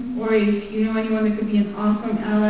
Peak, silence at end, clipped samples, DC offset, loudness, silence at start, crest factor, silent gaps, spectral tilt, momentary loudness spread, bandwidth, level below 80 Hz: -6 dBFS; 0 s; under 0.1%; 0.5%; -21 LUFS; 0 s; 14 dB; none; -11.5 dB/octave; 3 LU; 4 kHz; -52 dBFS